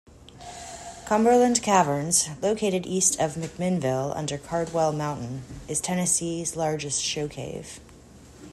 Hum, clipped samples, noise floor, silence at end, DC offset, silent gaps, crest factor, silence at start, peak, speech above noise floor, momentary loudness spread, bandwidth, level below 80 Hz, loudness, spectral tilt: none; under 0.1%; -49 dBFS; 0 s; under 0.1%; none; 20 dB; 0.2 s; -6 dBFS; 24 dB; 18 LU; 13.5 kHz; -54 dBFS; -24 LUFS; -4 dB/octave